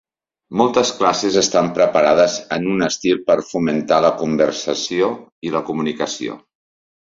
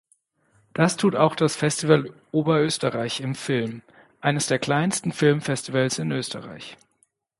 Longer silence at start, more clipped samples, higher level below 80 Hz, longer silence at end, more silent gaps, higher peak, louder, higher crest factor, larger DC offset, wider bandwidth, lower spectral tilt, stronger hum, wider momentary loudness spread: second, 0.5 s vs 0.75 s; neither; first, -58 dBFS vs -64 dBFS; about the same, 0.75 s vs 0.65 s; first, 5.32-5.42 s vs none; first, 0 dBFS vs -4 dBFS; first, -17 LUFS vs -23 LUFS; about the same, 16 dB vs 20 dB; neither; second, 7.8 kHz vs 11.5 kHz; about the same, -4 dB/octave vs -5 dB/octave; neither; second, 9 LU vs 12 LU